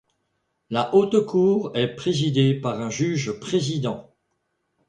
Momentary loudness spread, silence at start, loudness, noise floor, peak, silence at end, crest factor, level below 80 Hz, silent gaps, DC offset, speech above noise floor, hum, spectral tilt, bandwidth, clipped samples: 8 LU; 0.7 s; -22 LUFS; -74 dBFS; -6 dBFS; 0.85 s; 18 dB; -60 dBFS; none; under 0.1%; 52 dB; none; -6 dB/octave; 10 kHz; under 0.1%